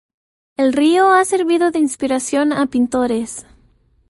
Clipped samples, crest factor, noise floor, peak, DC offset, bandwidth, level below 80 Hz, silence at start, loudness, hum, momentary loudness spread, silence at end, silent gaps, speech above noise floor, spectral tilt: under 0.1%; 14 dB; -55 dBFS; -2 dBFS; under 0.1%; 11.5 kHz; -54 dBFS; 0.6 s; -16 LUFS; none; 10 LU; 0.7 s; none; 40 dB; -3.5 dB/octave